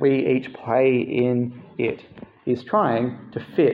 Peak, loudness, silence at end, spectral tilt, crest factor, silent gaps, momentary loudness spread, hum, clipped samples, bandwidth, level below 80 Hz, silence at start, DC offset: -6 dBFS; -23 LUFS; 0 s; -9.5 dB/octave; 16 dB; none; 10 LU; none; under 0.1%; 5.2 kHz; -64 dBFS; 0 s; under 0.1%